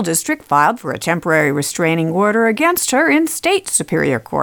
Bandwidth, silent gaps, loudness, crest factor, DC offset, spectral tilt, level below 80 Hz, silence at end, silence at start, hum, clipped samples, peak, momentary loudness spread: 19 kHz; none; -15 LUFS; 16 dB; under 0.1%; -4 dB/octave; -54 dBFS; 0 s; 0 s; none; under 0.1%; 0 dBFS; 4 LU